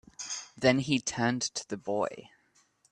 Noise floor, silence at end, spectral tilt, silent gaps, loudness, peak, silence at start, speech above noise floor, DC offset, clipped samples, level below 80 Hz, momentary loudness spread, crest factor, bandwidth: -68 dBFS; 0.65 s; -4 dB/octave; none; -30 LUFS; -10 dBFS; 0.2 s; 38 dB; under 0.1%; under 0.1%; -64 dBFS; 11 LU; 22 dB; 10.5 kHz